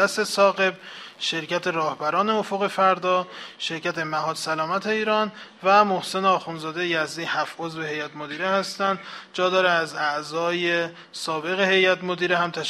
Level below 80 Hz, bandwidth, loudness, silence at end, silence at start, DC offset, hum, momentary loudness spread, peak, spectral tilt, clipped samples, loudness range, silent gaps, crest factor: -72 dBFS; 14 kHz; -23 LUFS; 0 s; 0 s; under 0.1%; none; 11 LU; -4 dBFS; -3.5 dB/octave; under 0.1%; 2 LU; none; 20 dB